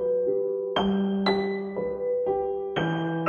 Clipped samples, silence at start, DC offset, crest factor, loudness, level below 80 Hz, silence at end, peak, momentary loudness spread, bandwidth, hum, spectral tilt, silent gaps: under 0.1%; 0 s; under 0.1%; 16 dB; -27 LUFS; -56 dBFS; 0 s; -10 dBFS; 5 LU; 6.8 kHz; none; -8 dB/octave; none